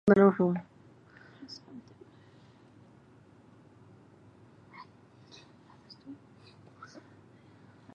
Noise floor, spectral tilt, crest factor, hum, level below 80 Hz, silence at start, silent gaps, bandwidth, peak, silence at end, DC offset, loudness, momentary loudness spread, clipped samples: -58 dBFS; -8.5 dB/octave; 28 dB; none; -70 dBFS; 0.05 s; none; 6.8 kHz; -6 dBFS; 1.8 s; under 0.1%; -26 LUFS; 31 LU; under 0.1%